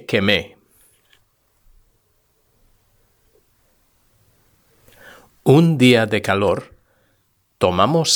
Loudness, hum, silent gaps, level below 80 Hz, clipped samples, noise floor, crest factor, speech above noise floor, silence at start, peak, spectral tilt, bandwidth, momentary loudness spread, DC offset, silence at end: -16 LUFS; none; none; -56 dBFS; under 0.1%; -64 dBFS; 20 dB; 49 dB; 0.1 s; 0 dBFS; -5 dB/octave; over 20 kHz; 9 LU; under 0.1%; 0 s